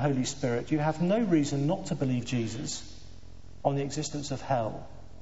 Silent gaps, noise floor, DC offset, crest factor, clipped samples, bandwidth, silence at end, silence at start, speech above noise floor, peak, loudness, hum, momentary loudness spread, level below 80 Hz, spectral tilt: none; -49 dBFS; 0.7%; 18 dB; under 0.1%; 8 kHz; 0 s; 0 s; 20 dB; -12 dBFS; -30 LUFS; none; 11 LU; -54 dBFS; -6 dB/octave